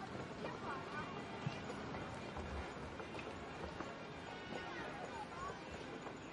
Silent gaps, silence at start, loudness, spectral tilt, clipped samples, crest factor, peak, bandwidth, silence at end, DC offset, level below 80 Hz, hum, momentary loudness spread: none; 0 s; -47 LUFS; -5.5 dB/octave; under 0.1%; 18 dB; -30 dBFS; 11.5 kHz; 0 s; under 0.1%; -62 dBFS; none; 4 LU